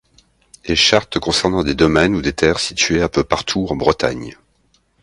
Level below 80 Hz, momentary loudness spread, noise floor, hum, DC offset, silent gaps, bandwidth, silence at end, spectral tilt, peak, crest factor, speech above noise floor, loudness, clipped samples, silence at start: -36 dBFS; 7 LU; -60 dBFS; none; under 0.1%; none; 11.5 kHz; 0.7 s; -4 dB/octave; 0 dBFS; 18 dB; 43 dB; -16 LUFS; under 0.1%; 0.65 s